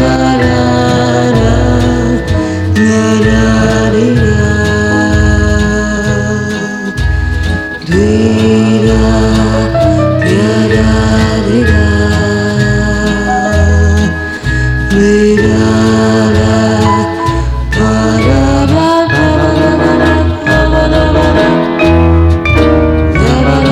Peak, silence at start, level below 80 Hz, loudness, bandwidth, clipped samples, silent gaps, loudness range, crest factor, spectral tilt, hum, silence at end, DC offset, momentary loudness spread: 0 dBFS; 0 s; -18 dBFS; -9 LUFS; 11.5 kHz; 1%; none; 2 LU; 8 dB; -6.5 dB/octave; none; 0 s; 0.2%; 5 LU